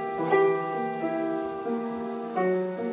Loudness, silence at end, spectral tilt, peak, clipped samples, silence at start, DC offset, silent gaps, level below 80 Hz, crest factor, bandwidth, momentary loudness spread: -28 LUFS; 0 s; -10.5 dB/octave; -10 dBFS; under 0.1%; 0 s; under 0.1%; none; -70 dBFS; 16 dB; 4 kHz; 8 LU